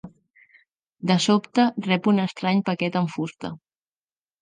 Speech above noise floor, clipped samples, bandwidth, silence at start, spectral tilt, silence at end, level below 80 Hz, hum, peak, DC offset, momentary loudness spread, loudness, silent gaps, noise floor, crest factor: over 68 dB; under 0.1%; 9.6 kHz; 0.05 s; -5.5 dB/octave; 0.85 s; -68 dBFS; none; -6 dBFS; under 0.1%; 12 LU; -23 LUFS; 0.30-0.34 s; under -90 dBFS; 18 dB